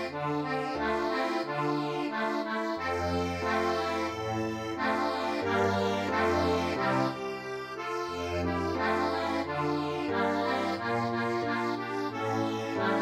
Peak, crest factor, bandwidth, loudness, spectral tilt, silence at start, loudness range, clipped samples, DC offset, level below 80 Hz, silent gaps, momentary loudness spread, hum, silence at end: -14 dBFS; 16 dB; 15.5 kHz; -30 LUFS; -5.5 dB/octave; 0 s; 2 LU; under 0.1%; under 0.1%; -56 dBFS; none; 5 LU; none; 0 s